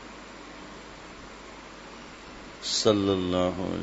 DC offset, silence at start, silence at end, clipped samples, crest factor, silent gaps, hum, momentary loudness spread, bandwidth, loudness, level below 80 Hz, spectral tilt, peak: under 0.1%; 0 s; 0 s; under 0.1%; 22 dB; none; none; 20 LU; 8 kHz; -26 LUFS; -56 dBFS; -4.5 dB/octave; -8 dBFS